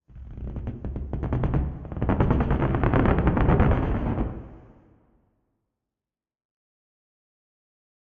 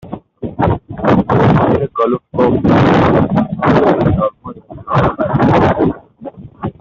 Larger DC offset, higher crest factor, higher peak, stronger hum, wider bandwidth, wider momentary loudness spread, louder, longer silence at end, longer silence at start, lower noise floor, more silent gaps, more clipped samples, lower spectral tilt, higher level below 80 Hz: neither; first, 22 dB vs 12 dB; about the same, -4 dBFS vs -2 dBFS; neither; second, 4.1 kHz vs 7.2 kHz; second, 14 LU vs 19 LU; second, -25 LUFS vs -13 LUFS; first, 3.4 s vs 0.1 s; about the same, 0.15 s vs 0.05 s; first, under -90 dBFS vs -32 dBFS; neither; neither; about the same, -8.5 dB/octave vs -9 dB/octave; about the same, -32 dBFS vs -34 dBFS